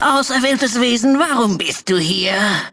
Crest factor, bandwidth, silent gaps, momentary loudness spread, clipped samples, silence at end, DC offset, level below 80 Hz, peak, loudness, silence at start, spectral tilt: 12 dB; 11 kHz; none; 3 LU; under 0.1%; 0.05 s; under 0.1%; -56 dBFS; -4 dBFS; -15 LUFS; 0 s; -3.5 dB/octave